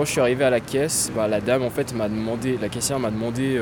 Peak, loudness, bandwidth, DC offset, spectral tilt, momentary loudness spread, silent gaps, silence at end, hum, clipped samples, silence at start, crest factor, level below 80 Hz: -6 dBFS; -23 LUFS; over 20 kHz; under 0.1%; -4.5 dB/octave; 5 LU; none; 0 s; none; under 0.1%; 0 s; 16 dB; -48 dBFS